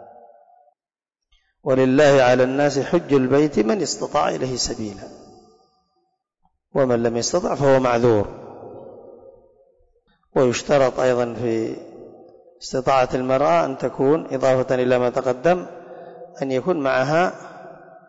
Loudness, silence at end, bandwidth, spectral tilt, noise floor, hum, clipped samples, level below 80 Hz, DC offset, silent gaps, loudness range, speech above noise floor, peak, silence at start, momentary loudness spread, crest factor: -19 LUFS; 0.35 s; 8 kHz; -5.5 dB/octave; -87 dBFS; none; under 0.1%; -50 dBFS; under 0.1%; none; 5 LU; 68 dB; -8 dBFS; 0 s; 21 LU; 14 dB